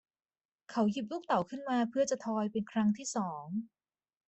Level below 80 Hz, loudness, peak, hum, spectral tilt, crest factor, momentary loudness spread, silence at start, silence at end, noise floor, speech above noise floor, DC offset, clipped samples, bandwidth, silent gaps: -76 dBFS; -34 LUFS; -16 dBFS; none; -5.5 dB/octave; 18 dB; 8 LU; 0.7 s; 0.6 s; under -90 dBFS; over 57 dB; under 0.1%; under 0.1%; 8.4 kHz; none